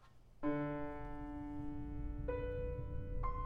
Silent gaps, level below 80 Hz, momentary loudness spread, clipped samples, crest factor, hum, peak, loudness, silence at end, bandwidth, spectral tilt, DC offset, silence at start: none; -48 dBFS; 7 LU; under 0.1%; 14 dB; none; -28 dBFS; -44 LUFS; 0 s; 4.7 kHz; -10 dB/octave; under 0.1%; 0 s